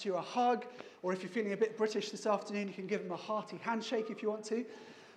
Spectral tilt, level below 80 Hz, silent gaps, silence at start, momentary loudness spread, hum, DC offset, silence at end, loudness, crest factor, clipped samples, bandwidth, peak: -5 dB/octave; under -90 dBFS; none; 0 s; 7 LU; none; under 0.1%; 0 s; -37 LUFS; 18 dB; under 0.1%; 10.5 kHz; -20 dBFS